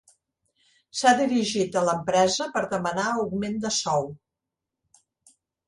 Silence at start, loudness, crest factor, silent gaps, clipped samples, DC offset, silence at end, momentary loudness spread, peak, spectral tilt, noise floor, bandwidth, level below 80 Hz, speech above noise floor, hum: 0.95 s; -24 LUFS; 20 dB; none; under 0.1%; under 0.1%; 1.5 s; 7 LU; -6 dBFS; -3.5 dB/octave; -86 dBFS; 11.5 kHz; -64 dBFS; 62 dB; none